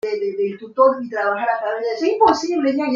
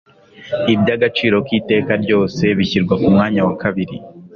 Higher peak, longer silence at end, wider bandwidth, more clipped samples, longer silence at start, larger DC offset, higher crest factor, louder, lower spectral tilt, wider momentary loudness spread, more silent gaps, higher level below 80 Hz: about the same, -2 dBFS vs -2 dBFS; about the same, 0 s vs 0.1 s; first, 7.6 kHz vs 6.8 kHz; neither; second, 0.05 s vs 0.4 s; neither; about the same, 18 dB vs 14 dB; second, -19 LUFS vs -16 LUFS; second, -4.5 dB/octave vs -7 dB/octave; about the same, 7 LU vs 8 LU; neither; second, -64 dBFS vs -46 dBFS